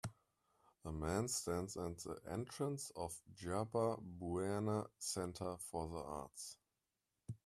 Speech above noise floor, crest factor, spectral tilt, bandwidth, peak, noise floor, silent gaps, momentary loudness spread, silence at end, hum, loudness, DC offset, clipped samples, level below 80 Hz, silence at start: 46 dB; 20 dB; -5 dB/octave; 15 kHz; -24 dBFS; -90 dBFS; none; 12 LU; 0.1 s; none; -44 LUFS; under 0.1%; under 0.1%; -66 dBFS; 0.05 s